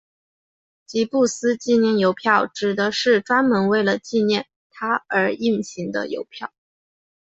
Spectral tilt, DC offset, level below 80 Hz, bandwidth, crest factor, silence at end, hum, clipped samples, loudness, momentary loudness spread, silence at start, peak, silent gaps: -4.5 dB/octave; under 0.1%; -66 dBFS; 8.2 kHz; 18 dB; 0.8 s; none; under 0.1%; -20 LUFS; 12 LU; 0.9 s; -2 dBFS; 4.56-4.70 s